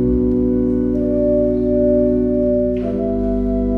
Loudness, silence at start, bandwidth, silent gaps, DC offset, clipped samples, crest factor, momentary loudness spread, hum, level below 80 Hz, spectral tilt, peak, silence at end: -17 LUFS; 0 s; 3.1 kHz; none; under 0.1%; under 0.1%; 12 dB; 4 LU; none; -28 dBFS; -11.5 dB/octave; -4 dBFS; 0 s